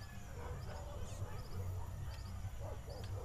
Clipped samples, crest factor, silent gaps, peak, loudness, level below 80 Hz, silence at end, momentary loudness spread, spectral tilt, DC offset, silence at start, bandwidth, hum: under 0.1%; 12 dB; none; -32 dBFS; -48 LUFS; -50 dBFS; 0 s; 3 LU; -5.5 dB/octave; under 0.1%; 0 s; 15.5 kHz; none